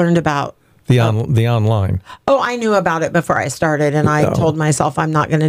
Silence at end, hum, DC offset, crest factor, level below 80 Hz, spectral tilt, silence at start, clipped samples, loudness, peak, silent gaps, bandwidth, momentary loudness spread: 0 s; none; under 0.1%; 12 dB; -44 dBFS; -6.5 dB/octave; 0 s; under 0.1%; -16 LUFS; -2 dBFS; none; 15 kHz; 4 LU